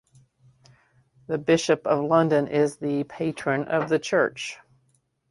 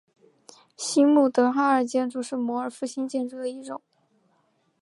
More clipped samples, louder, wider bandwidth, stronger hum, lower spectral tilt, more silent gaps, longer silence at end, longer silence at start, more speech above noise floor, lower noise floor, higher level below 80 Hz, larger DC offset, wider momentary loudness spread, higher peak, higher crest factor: neither; about the same, -24 LUFS vs -24 LUFS; about the same, 11.5 kHz vs 11.5 kHz; neither; first, -5.5 dB/octave vs -3.5 dB/octave; neither; second, 0.75 s vs 1.05 s; first, 1.3 s vs 0.8 s; about the same, 45 dB vs 45 dB; about the same, -68 dBFS vs -68 dBFS; first, -66 dBFS vs -82 dBFS; neither; second, 10 LU vs 14 LU; about the same, -6 dBFS vs -8 dBFS; about the same, 20 dB vs 18 dB